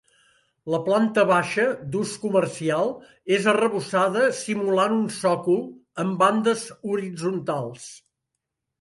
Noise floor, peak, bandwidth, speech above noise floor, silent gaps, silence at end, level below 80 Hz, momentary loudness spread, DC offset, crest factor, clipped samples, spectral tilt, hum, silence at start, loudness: -82 dBFS; -6 dBFS; 11.5 kHz; 59 dB; none; 0.85 s; -68 dBFS; 9 LU; under 0.1%; 18 dB; under 0.1%; -5 dB/octave; none; 0.65 s; -23 LUFS